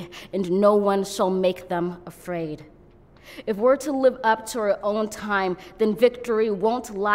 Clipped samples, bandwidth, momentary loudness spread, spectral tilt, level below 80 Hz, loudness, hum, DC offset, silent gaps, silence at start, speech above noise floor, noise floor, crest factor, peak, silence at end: under 0.1%; 16 kHz; 11 LU; -5.5 dB/octave; -56 dBFS; -23 LUFS; none; under 0.1%; none; 0 s; 29 dB; -51 dBFS; 18 dB; -4 dBFS; 0 s